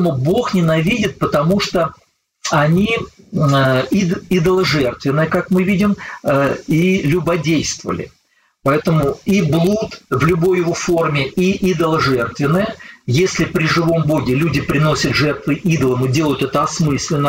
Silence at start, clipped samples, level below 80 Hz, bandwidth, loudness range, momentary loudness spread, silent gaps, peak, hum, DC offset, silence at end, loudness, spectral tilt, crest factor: 0 s; under 0.1%; -42 dBFS; 16.5 kHz; 1 LU; 5 LU; none; -2 dBFS; none; under 0.1%; 0 s; -16 LUFS; -6 dB/octave; 14 dB